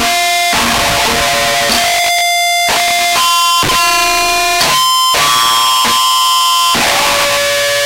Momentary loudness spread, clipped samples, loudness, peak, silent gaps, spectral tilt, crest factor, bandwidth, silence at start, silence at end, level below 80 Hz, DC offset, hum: 2 LU; under 0.1%; -9 LUFS; 0 dBFS; none; -0.5 dB/octave; 10 dB; 16 kHz; 0 s; 0 s; -36 dBFS; under 0.1%; none